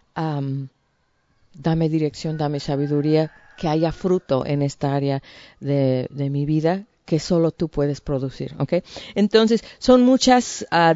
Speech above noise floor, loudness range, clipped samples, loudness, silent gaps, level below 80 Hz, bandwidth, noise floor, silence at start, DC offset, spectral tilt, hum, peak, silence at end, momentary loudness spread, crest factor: 46 dB; 4 LU; under 0.1%; -21 LUFS; none; -48 dBFS; 8 kHz; -66 dBFS; 0.15 s; under 0.1%; -6 dB/octave; none; 0 dBFS; 0 s; 12 LU; 20 dB